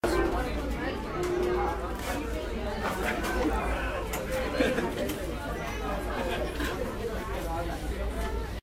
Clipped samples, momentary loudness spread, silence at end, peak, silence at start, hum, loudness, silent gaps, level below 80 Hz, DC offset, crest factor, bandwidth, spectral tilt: under 0.1%; 6 LU; 0.05 s; -14 dBFS; 0.05 s; none; -31 LUFS; none; -36 dBFS; under 0.1%; 18 dB; 16 kHz; -5.5 dB/octave